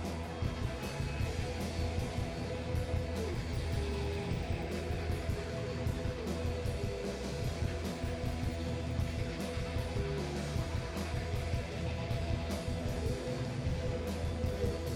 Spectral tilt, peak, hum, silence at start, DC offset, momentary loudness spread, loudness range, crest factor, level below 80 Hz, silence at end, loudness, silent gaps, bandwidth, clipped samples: -6 dB/octave; -22 dBFS; none; 0 s; under 0.1%; 2 LU; 1 LU; 14 dB; -42 dBFS; 0 s; -37 LUFS; none; 15.5 kHz; under 0.1%